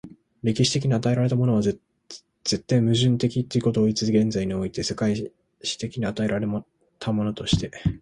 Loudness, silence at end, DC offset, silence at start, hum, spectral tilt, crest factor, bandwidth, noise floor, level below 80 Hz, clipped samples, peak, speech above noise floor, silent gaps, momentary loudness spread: -24 LUFS; 0.05 s; under 0.1%; 0.05 s; none; -6 dB/octave; 16 dB; 11.5 kHz; -47 dBFS; -46 dBFS; under 0.1%; -8 dBFS; 24 dB; none; 11 LU